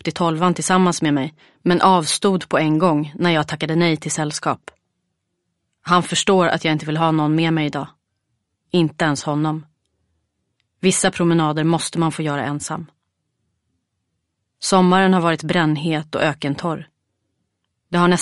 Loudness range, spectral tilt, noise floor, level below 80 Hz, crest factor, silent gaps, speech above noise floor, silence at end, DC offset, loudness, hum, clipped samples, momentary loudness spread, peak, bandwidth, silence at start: 5 LU; -5 dB/octave; -74 dBFS; -58 dBFS; 18 dB; none; 56 dB; 0 s; under 0.1%; -18 LUFS; none; under 0.1%; 9 LU; -2 dBFS; 11.5 kHz; 0.05 s